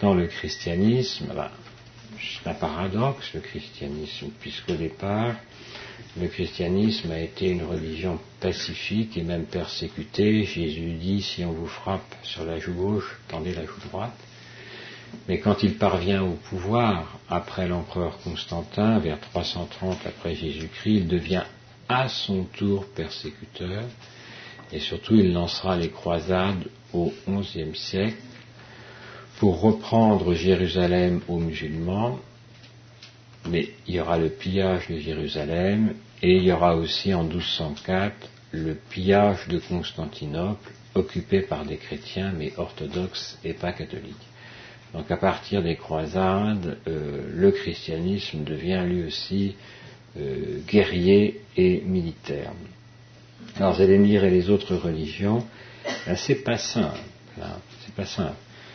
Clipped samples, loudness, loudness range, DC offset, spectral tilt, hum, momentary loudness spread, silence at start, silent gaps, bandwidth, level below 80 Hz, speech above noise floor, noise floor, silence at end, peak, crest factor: under 0.1%; -25 LUFS; 7 LU; under 0.1%; -6.5 dB/octave; none; 18 LU; 0 s; none; 6.6 kHz; -48 dBFS; 24 dB; -49 dBFS; 0 s; -6 dBFS; 20 dB